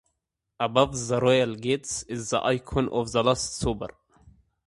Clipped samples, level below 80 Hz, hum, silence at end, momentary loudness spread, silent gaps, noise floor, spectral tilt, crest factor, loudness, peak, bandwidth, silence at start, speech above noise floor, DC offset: under 0.1%; -48 dBFS; none; 0.4 s; 9 LU; none; -81 dBFS; -4.5 dB/octave; 22 dB; -26 LUFS; -4 dBFS; 11.5 kHz; 0.6 s; 56 dB; under 0.1%